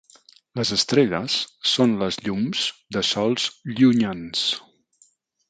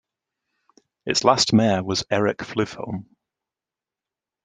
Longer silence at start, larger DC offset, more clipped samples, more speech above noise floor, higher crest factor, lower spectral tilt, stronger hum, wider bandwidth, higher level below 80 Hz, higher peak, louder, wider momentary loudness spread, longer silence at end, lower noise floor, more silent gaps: second, 0.55 s vs 1.05 s; neither; neither; second, 39 dB vs 68 dB; second, 18 dB vs 24 dB; about the same, -4 dB/octave vs -4.5 dB/octave; neither; about the same, 9.4 kHz vs 9.6 kHz; about the same, -58 dBFS vs -60 dBFS; about the same, -4 dBFS vs -2 dBFS; about the same, -22 LUFS vs -21 LUFS; second, 7 LU vs 16 LU; second, 0.9 s vs 1.4 s; second, -61 dBFS vs -89 dBFS; neither